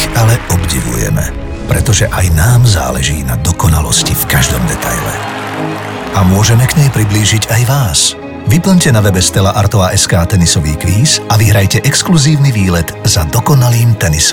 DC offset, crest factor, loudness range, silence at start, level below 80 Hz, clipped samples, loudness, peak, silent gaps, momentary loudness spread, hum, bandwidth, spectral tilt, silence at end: under 0.1%; 10 dB; 2 LU; 0 s; -22 dBFS; under 0.1%; -10 LUFS; 0 dBFS; none; 7 LU; none; 17.5 kHz; -4.5 dB/octave; 0 s